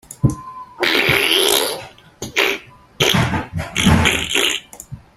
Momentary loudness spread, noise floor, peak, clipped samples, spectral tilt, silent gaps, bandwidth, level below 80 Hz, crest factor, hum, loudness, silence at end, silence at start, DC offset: 17 LU; -37 dBFS; 0 dBFS; under 0.1%; -3.5 dB/octave; none; 16 kHz; -38 dBFS; 18 dB; none; -16 LUFS; 0.2 s; 0.1 s; under 0.1%